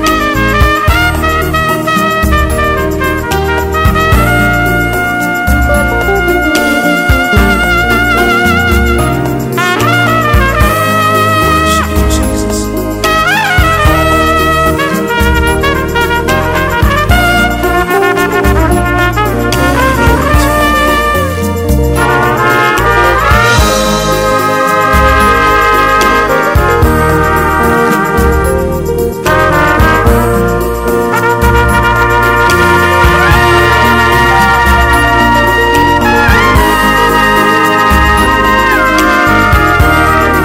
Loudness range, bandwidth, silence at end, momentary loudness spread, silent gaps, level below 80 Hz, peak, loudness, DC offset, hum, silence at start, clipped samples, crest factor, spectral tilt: 3 LU; 16.5 kHz; 0 s; 5 LU; none; -16 dBFS; 0 dBFS; -8 LUFS; 0.5%; none; 0 s; under 0.1%; 8 dB; -5 dB/octave